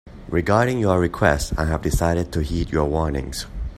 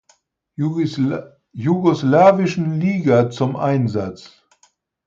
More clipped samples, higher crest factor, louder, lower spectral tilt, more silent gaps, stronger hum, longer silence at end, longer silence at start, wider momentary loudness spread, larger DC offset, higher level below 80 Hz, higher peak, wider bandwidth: neither; about the same, 20 dB vs 16 dB; second, -21 LUFS vs -18 LUFS; second, -6 dB/octave vs -8 dB/octave; neither; neither; second, 0 s vs 0.8 s; second, 0.05 s vs 0.6 s; second, 7 LU vs 14 LU; neither; first, -30 dBFS vs -56 dBFS; about the same, 0 dBFS vs -2 dBFS; first, 15 kHz vs 7.8 kHz